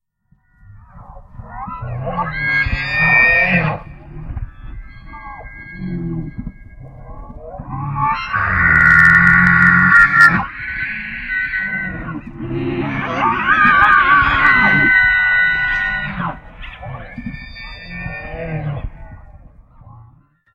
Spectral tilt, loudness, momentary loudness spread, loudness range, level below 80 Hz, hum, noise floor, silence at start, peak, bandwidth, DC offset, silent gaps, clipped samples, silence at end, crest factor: -6 dB/octave; -13 LUFS; 24 LU; 19 LU; -34 dBFS; none; -58 dBFS; 0.75 s; 0 dBFS; 13.5 kHz; under 0.1%; none; under 0.1%; 0.6 s; 16 dB